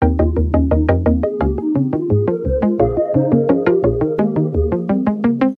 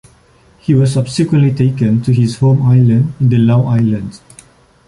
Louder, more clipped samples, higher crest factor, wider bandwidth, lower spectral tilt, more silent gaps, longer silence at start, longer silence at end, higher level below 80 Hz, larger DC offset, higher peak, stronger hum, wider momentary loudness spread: second, -16 LUFS vs -12 LUFS; neither; about the same, 14 dB vs 10 dB; second, 4.5 kHz vs 11.5 kHz; first, -11.5 dB/octave vs -8 dB/octave; neither; second, 0 s vs 0.7 s; second, 0.05 s vs 0.7 s; first, -26 dBFS vs -44 dBFS; neither; about the same, 0 dBFS vs -2 dBFS; neither; second, 3 LU vs 6 LU